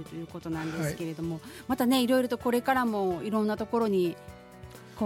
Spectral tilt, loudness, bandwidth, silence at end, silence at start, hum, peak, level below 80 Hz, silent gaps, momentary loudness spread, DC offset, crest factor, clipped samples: -5.5 dB/octave; -29 LUFS; 17 kHz; 0 s; 0 s; none; -12 dBFS; -58 dBFS; none; 20 LU; under 0.1%; 18 dB; under 0.1%